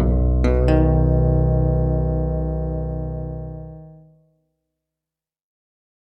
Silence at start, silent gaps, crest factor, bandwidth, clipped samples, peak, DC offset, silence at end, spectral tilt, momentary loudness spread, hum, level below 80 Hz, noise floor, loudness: 0 s; none; 18 dB; 5.4 kHz; under 0.1%; -2 dBFS; under 0.1%; 2.15 s; -10.5 dB/octave; 15 LU; none; -24 dBFS; -89 dBFS; -20 LUFS